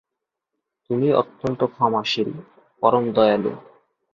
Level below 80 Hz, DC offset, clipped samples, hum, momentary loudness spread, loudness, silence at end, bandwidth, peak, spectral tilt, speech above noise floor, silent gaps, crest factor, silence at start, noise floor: -60 dBFS; under 0.1%; under 0.1%; none; 10 LU; -21 LUFS; 0.55 s; 7.4 kHz; -2 dBFS; -6.5 dB/octave; 63 dB; none; 20 dB; 0.9 s; -83 dBFS